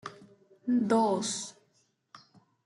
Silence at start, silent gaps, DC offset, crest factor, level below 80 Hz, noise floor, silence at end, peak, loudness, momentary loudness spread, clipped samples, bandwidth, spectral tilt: 0.05 s; none; under 0.1%; 20 dB; -80 dBFS; -72 dBFS; 0.5 s; -12 dBFS; -29 LUFS; 17 LU; under 0.1%; 11.5 kHz; -4.5 dB/octave